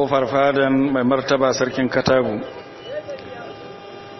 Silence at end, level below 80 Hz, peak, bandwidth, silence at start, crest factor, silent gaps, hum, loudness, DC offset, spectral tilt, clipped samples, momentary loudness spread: 0 s; -52 dBFS; -4 dBFS; 6.2 kHz; 0 s; 16 dB; none; none; -18 LUFS; under 0.1%; -4.5 dB/octave; under 0.1%; 18 LU